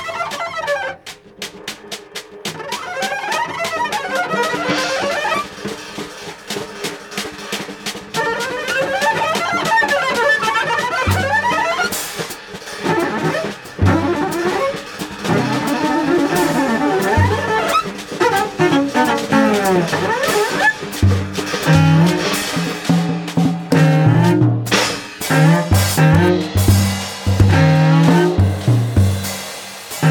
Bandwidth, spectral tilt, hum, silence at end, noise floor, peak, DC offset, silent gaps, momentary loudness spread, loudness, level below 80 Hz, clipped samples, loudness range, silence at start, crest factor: 18 kHz; -5.5 dB/octave; none; 0 s; -36 dBFS; -2 dBFS; under 0.1%; none; 14 LU; -16 LUFS; -38 dBFS; under 0.1%; 8 LU; 0 s; 14 dB